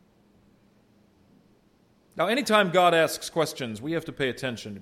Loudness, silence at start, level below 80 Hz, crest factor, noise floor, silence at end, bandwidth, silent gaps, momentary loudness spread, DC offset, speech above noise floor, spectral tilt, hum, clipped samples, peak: -25 LUFS; 2.15 s; -66 dBFS; 22 dB; -62 dBFS; 0 s; 16 kHz; none; 13 LU; under 0.1%; 37 dB; -4 dB/octave; none; under 0.1%; -6 dBFS